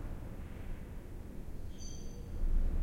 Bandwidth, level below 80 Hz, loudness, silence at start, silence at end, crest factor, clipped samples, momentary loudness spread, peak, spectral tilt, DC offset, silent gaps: 7.2 kHz; -38 dBFS; -45 LUFS; 0 s; 0 s; 16 dB; under 0.1%; 10 LU; -20 dBFS; -6 dB/octave; under 0.1%; none